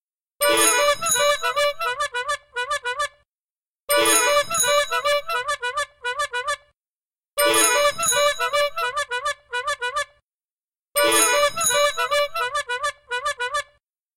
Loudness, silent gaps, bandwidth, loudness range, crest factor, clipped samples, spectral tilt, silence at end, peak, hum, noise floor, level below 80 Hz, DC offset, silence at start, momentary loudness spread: -21 LUFS; 3.37-3.55 s, 3.61-3.73 s, 3.80-3.87 s, 6.76-6.81 s, 6.87-7.02 s, 10.23-10.38 s, 10.52-10.83 s; 17 kHz; 2 LU; 18 dB; under 0.1%; 0.5 dB/octave; 0.55 s; -4 dBFS; none; under -90 dBFS; -58 dBFS; under 0.1%; 0.4 s; 11 LU